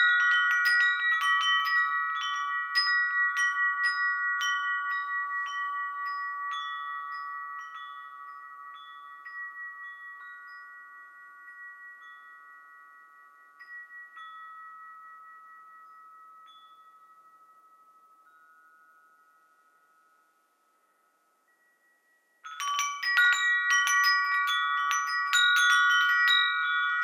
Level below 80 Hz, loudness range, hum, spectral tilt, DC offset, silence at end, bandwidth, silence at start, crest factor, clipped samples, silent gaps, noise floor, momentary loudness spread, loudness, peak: under -90 dBFS; 24 LU; none; 7 dB/octave; under 0.1%; 0 s; 17 kHz; 0 s; 22 dB; under 0.1%; none; -70 dBFS; 24 LU; -25 LUFS; -8 dBFS